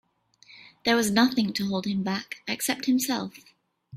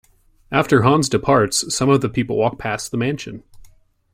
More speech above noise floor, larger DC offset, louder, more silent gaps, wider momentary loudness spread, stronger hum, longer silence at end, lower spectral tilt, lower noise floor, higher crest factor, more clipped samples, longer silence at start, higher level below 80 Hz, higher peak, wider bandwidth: about the same, 32 dB vs 32 dB; neither; second, -26 LUFS vs -18 LUFS; neither; about the same, 10 LU vs 10 LU; neither; second, 0 s vs 0.55 s; about the same, -4 dB/octave vs -5 dB/octave; first, -58 dBFS vs -50 dBFS; about the same, 20 dB vs 18 dB; neither; about the same, 0.5 s vs 0.5 s; second, -66 dBFS vs -48 dBFS; second, -8 dBFS vs -2 dBFS; about the same, 16 kHz vs 16 kHz